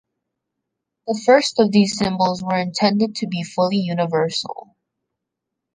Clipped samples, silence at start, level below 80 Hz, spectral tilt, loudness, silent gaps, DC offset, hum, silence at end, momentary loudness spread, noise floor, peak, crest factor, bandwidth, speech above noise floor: under 0.1%; 1.05 s; -58 dBFS; -5 dB/octave; -19 LUFS; none; under 0.1%; none; 1.15 s; 11 LU; -81 dBFS; -2 dBFS; 18 dB; 9.8 kHz; 63 dB